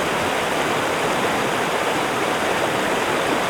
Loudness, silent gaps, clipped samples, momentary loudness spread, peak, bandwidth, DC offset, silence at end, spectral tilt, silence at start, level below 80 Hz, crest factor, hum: -20 LUFS; none; under 0.1%; 1 LU; -8 dBFS; 19.5 kHz; under 0.1%; 0 s; -3 dB/octave; 0 s; -52 dBFS; 14 dB; none